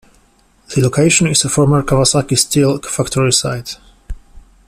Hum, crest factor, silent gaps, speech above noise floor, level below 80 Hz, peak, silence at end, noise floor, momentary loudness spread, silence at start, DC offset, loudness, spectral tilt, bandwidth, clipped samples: none; 16 dB; none; 39 dB; -36 dBFS; 0 dBFS; 0.3 s; -52 dBFS; 10 LU; 0.7 s; under 0.1%; -13 LUFS; -4 dB/octave; 15 kHz; under 0.1%